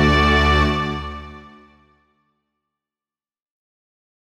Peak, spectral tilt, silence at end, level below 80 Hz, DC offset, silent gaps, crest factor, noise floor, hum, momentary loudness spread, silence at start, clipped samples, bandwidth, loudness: -4 dBFS; -6 dB/octave; 2.85 s; -28 dBFS; under 0.1%; none; 18 dB; under -90 dBFS; none; 20 LU; 0 s; under 0.1%; 10 kHz; -17 LUFS